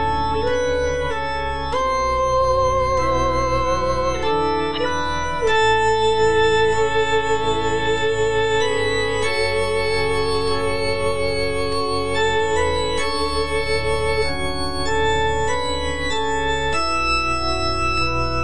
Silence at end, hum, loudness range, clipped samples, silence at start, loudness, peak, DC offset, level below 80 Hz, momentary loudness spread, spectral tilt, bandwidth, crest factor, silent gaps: 0 s; none; 3 LU; under 0.1%; 0 s; -20 LUFS; -6 dBFS; 4%; -34 dBFS; 5 LU; -4 dB/octave; 10.5 kHz; 12 dB; none